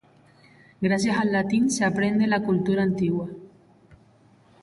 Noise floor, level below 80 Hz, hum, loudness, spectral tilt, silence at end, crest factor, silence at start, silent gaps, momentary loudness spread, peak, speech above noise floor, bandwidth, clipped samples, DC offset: -57 dBFS; -58 dBFS; none; -23 LUFS; -5.5 dB/octave; 0.7 s; 14 dB; 0.8 s; none; 7 LU; -10 dBFS; 34 dB; 11.5 kHz; under 0.1%; under 0.1%